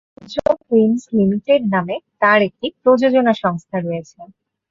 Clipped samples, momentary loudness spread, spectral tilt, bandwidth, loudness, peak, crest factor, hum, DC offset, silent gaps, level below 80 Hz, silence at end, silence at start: under 0.1%; 10 LU; -7 dB/octave; 7.6 kHz; -17 LUFS; -2 dBFS; 16 dB; none; under 0.1%; none; -56 dBFS; 0.45 s; 0.3 s